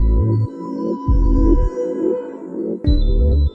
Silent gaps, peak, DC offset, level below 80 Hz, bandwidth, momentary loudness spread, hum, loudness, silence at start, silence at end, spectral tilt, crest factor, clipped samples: none; -2 dBFS; under 0.1%; -18 dBFS; 5.6 kHz; 9 LU; none; -19 LUFS; 0 s; 0 s; -10 dB/octave; 14 dB; under 0.1%